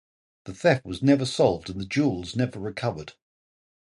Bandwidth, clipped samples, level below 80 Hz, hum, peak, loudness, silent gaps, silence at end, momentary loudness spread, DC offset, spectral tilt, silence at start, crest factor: 11.5 kHz; under 0.1%; -54 dBFS; none; -6 dBFS; -25 LUFS; none; 0.85 s; 18 LU; under 0.1%; -6 dB/octave; 0.45 s; 20 dB